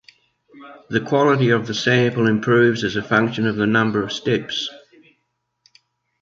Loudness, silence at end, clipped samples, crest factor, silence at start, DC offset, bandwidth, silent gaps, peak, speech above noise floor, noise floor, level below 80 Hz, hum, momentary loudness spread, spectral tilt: -19 LUFS; 1.45 s; under 0.1%; 18 dB; 0.55 s; under 0.1%; 7.6 kHz; none; -2 dBFS; 54 dB; -73 dBFS; -56 dBFS; none; 9 LU; -6 dB/octave